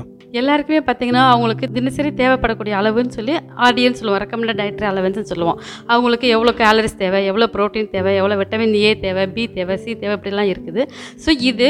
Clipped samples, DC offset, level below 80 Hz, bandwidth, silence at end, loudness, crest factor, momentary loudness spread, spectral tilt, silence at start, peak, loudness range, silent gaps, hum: under 0.1%; under 0.1%; -44 dBFS; 12.5 kHz; 0 s; -17 LUFS; 16 dB; 9 LU; -5.5 dB/octave; 0 s; 0 dBFS; 3 LU; none; none